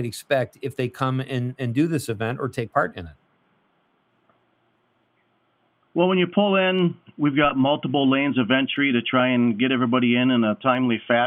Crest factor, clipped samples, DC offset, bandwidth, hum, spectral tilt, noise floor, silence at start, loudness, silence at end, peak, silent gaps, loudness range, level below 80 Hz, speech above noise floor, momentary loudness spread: 16 dB; under 0.1%; under 0.1%; 15 kHz; none; -6.5 dB/octave; -67 dBFS; 0 s; -22 LUFS; 0 s; -6 dBFS; none; 11 LU; -62 dBFS; 45 dB; 9 LU